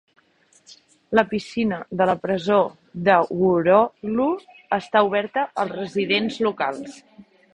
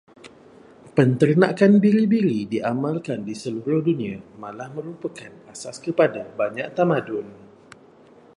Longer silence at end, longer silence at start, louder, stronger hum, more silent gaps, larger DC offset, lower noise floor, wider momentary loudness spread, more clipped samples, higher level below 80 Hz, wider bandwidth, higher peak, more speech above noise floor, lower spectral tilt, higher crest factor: second, 0.35 s vs 1.05 s; first, 0.7 s vs 0.25 s; about the same, -21 LUFS vs -21 LUFS; neither; neither; neither; first, -59 dBFS vs -50 dBFS; second, 9 LU vs 19 LU; neither; first, -60 dBFS vs -66 dBFS; about the same, 10 kHz vs 11 kHz; about the same, -2 dBFS vs -2 dBFS; first, 38 dB vs 29 dB; second, -6 dB/octave vs -7.5 dB/octave; about the same, 22 dB vs 20 dB